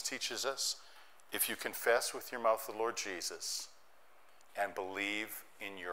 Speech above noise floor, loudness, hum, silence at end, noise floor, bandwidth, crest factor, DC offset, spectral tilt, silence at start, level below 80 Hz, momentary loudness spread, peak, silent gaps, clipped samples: 28 dB; -37 LUFS; none; 0 s; -66 dBFS; 16 kHz; 20 dB; 0.1%; -0.5 dB/octave; 0 s; -82 dBFS; 11 LU; -18 dBFS; none; under 0.1%